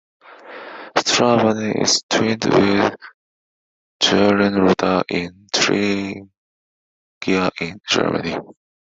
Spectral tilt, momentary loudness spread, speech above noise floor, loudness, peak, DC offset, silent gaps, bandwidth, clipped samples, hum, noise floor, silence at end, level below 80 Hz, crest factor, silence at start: -4 dB/octave; 14 LU; 20 dB; -18 LUFS; 0 dBFS; under 0.1%; 2.03-2.09 s, 3.14-4.00 s, 6.37-7.21 s; 8.2 kHz; under 0.1%; none; -37 dBFS; 0.45 s; -58 dBFS; 20 dB; 0.3 s